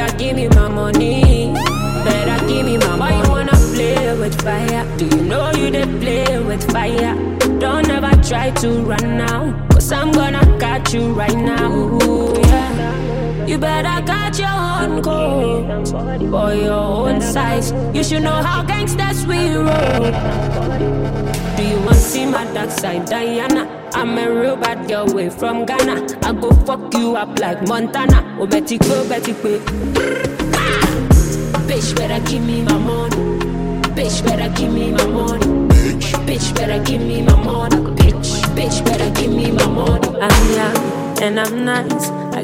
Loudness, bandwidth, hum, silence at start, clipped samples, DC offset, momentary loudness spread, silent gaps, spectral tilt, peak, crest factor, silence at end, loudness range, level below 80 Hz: -16 LUFS; 16.5 kHz; none; 0 s; under 0.1%; under 0.1%; 6 LU; none; -5.5 dB/octave; 0 dBFS; 14 dB; 0 s; 3 LU; -20 dBFS